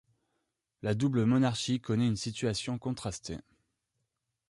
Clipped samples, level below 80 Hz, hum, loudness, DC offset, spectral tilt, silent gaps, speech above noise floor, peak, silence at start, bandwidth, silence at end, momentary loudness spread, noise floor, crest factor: under 0.1%; -60 dBFS; none; -31 LUFS; under 0.1%; -6 dB/octave; none; 53 dB; -16 dBFS; 0.85 s; 11.5 kHz; 1.1 s; 12 LU; -83 dBFS; 16 dB